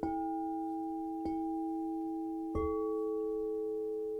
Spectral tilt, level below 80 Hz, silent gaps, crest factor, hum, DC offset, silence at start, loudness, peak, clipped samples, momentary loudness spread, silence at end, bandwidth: -9.5 dB/octave; -54 dBFS; none; 14 dB; none; under 0.1%; 0 s; -37 LUFS; -22 dBFS; under 0.1%; 3 LU; 0 s; 5.2 kHz